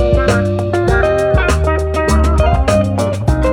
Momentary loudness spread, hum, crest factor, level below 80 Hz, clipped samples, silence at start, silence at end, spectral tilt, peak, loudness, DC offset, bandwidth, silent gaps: 3 LU; none; 12 dB; -18 dBFS; under 0.1%; 0 s; 0 s; -6.5 dB/octave; 0 dBFS; -14 LUFS; under 0.1%; 12.5 kHz; none